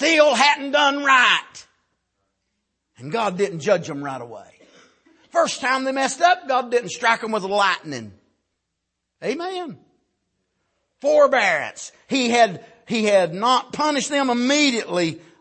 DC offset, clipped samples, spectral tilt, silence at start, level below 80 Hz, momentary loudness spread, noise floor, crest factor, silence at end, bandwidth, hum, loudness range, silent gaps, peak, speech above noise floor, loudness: under 0.1%; under 0.1%; -3 dB/octave; 0 s; -72 dBFS; 16 LU; -78 dBFS; 20 dB; 0.25 s; 8.8 kHz; none; 8 LU; none; -2 dBFS; 59 dB; -19 LUFS